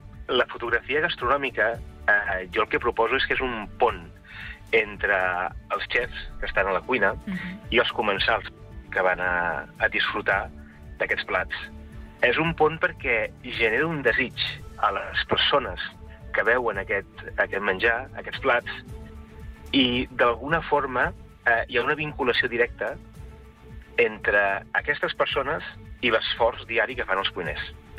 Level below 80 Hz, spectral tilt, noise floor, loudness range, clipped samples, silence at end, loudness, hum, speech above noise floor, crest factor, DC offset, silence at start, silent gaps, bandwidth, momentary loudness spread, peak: -44 dBFS; -5.5 dB/octave; -45 dBFS; 2 LU; under 0.1%; 0 s; -24 LUFS; none; 20 dB; 16 dB; under 0.1%; 0 s; none; 13.5 kHz; 12 LU; -8 dBFS